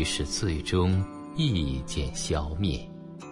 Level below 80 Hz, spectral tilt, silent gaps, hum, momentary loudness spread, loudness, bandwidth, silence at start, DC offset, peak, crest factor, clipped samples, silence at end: -40 dBFS; -5 dB/octave; none; none; 9 LU; -29 LUFS; 11.5 kHz; 0 s; under 0.1%; -14 dBFS; 16 dB; under 0.1%; 0 s